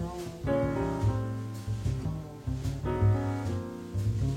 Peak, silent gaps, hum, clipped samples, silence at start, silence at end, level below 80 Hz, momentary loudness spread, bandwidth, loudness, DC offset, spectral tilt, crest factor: -16 dBFS; none; none; under 0.1%; 0 s; 0 s; -42 dBFS; 9 LU; 13.5 kHz; -32 LUFS; under 0.1%; -8 dB/octave; 14 dB